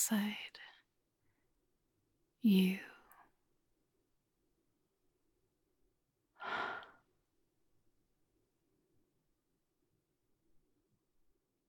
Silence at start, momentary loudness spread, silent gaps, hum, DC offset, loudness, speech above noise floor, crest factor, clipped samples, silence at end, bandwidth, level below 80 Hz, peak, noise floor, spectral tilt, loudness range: 0 s; 24 LU; none; none; under 0.1%; -36 LUFS; 49 dB; 24 dB; under 0.1%; 4.85 s; 17.5 kHz; -84 dBFS; -20 dBFS; -83 dBFS; -4.5 dB/octave; 10 LU